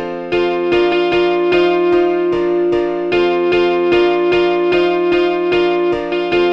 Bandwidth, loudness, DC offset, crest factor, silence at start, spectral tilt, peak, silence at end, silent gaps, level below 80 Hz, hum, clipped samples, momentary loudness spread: 6.2 kHz; -14 LUFS; under 0.1%; 12 dB; 0 s; -6.5 dB/octave; -2 dBFS; 0 s; none; -44 dBFS; none; under 0.1%; 3 LU